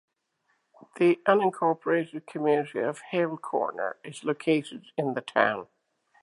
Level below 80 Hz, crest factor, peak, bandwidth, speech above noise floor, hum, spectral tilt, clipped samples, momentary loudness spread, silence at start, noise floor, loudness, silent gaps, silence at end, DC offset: -82 dBFS; 22 dB; -6 dBFS; 11.5 kHz; 47 dB; none; -6 dB/octave; under 0.1%; 11 LU; 0.95 s; -74 dBFS; -27 LUFS; none; 0.6 s; under 0.1%